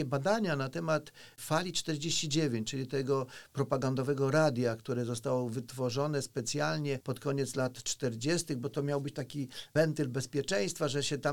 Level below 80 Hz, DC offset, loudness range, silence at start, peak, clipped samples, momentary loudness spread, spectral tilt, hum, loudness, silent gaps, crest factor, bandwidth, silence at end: -66 dBFS; 0.1%; 2 LU; 0 s; -14 dBFS; under 0.1%; 6 LU; -5 dB/octave; none; -33 LUFS; none; 20 dB; 19 kHz; 0 s